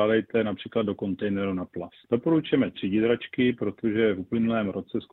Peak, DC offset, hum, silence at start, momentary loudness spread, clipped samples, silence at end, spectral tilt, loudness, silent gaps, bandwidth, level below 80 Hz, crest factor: -10 dBFS; under 0.1%; none; 0 s; 6 LU; under 0.1%; 0.1 s; -9.5 dB/octave; -26 LUFS; none; 4.1 kHz; -62 dBFS; 16 dB